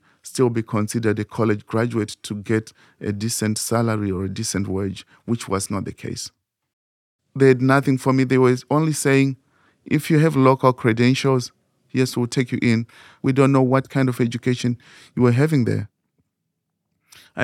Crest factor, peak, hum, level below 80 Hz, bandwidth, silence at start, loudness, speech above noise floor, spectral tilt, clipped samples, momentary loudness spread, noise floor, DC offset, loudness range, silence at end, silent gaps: 20 dB; -2 dBFS; none; -60 dBFS; 15 kHz; 0.25 s; -20 LUFS; 58 dB; -6 dB/octave; under 0.1%; 14 LU; -77 dBFS; under 0.1%; 6 LU; 0 s; 6.73-7.19 s